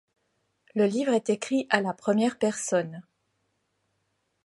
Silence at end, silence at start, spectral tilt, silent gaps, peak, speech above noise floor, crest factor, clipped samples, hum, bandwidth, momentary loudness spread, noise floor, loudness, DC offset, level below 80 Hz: 1.45 s; 0.75 s; -4.5 dB/octave; none; -6 dBFS; 50 dB; 24 dB; under 0.1%; none; 11.5 kHz; 7 LU; -76 dBFS; -26 LUFS; under 0.1%; -78 dBFS